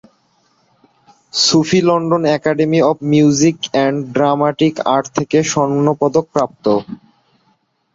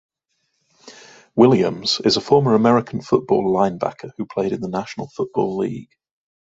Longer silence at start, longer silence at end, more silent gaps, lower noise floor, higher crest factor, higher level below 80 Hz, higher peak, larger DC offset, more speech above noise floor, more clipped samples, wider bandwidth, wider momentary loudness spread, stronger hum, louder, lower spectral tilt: first, 1.35 s vs 0.85 s; first, 1 s vs 0.65 s; neither; second, -61 dBFS vs -72 dBFS; about the same, 14 dB vs 18 dB; about the same, -54 dBFS vs -58 dBFS; about the same, -2 dBFS vs -2 dBFS; neither; second, 47 dB vs 53 dB; neither; about the same, 8 kHz vs 8 kHz; second, 5 LU vs 13 LU; neither; first, -14 LUFS vs -19 LUFS; about the same, -5 dB/octave vs -6 dB/octave